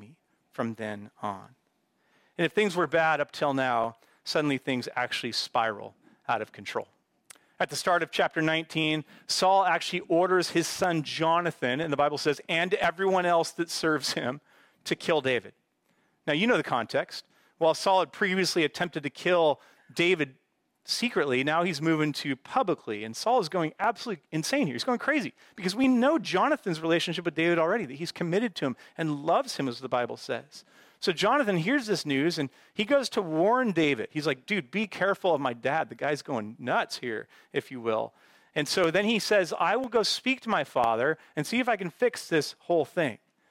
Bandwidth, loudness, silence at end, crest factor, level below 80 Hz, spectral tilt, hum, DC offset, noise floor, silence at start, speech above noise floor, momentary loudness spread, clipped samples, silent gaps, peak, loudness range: 16.5 kHz; -28 LUFS; 0.35 s; 16 dB; -72 dBFS; -4.5 dB/octave; none; under 0.1%; -72 dBFS; 0 s; 45 dB; 10 LU; under 0.1%; none; -12 dBFS; 4 LU